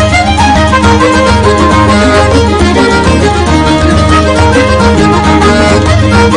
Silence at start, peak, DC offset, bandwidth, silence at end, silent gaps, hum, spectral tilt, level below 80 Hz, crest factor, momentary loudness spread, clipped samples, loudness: 0 s; 0 dBFS; under 0.1%; 10.5 kHz; 0 s; none; none; -5.5 dB/octave; -18 dBFS; 6 dB; 1 LU; 3%; -6 LUFS